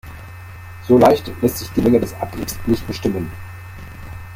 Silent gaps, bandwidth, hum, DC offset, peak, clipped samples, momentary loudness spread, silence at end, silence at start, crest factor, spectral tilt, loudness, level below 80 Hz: none; 16.5 kHz; none; under 0.1%; -2 dBFS; under 0.1%; 23 LU; 0 s; 0.05 s; 18 dB; -6.5 dB/octave; -18 LUFS; -38 dBFS